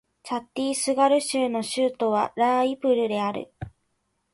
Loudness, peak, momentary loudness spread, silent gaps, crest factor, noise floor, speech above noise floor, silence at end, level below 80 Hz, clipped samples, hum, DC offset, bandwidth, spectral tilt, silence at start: -24 LUFS; -8 dBFS; 13 LU; none; 16 dB; -74 dBFS; 50 dB; 0.65 s; -60 dBFS; under 0.1%; none; under 0.1%; 11.5 kHz; -4 dB/octave; 0.25 s